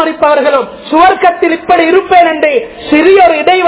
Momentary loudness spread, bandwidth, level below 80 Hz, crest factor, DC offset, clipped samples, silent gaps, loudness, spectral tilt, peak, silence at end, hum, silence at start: 7 LU; 4 kHz; -44 dBFS; 8 dB; under 0.1%; 5%; none; -8 LUFS; -7.5 dB/octave; 0 dBFS; 0 s; none; 0 s